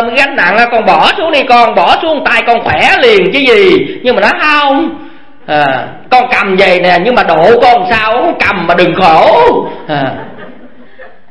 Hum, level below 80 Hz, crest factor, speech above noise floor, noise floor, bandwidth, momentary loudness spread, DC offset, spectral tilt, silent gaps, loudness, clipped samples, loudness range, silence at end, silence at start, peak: none; -40 dBFS; 8 dB; 28 dB; -35 dBFS; 11 kHz; 9 LU; 4%; -5 dB/octave; none; -7 LUFS; 2%; 2 LU; 0.25 s; 0 s; 0 dBFS